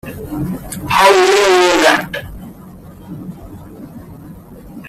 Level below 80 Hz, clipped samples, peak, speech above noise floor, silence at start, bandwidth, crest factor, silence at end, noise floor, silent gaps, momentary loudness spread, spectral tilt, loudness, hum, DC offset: -40 dBFS; under 0.1%; 0 dBFS; 23 dB; 0.05 s; 15.5 kHz; 16 dB; 0 s; -36 dBFS; none; 25 LU; -3.5 dB/octave; -12 LUFS; none; under 0.1%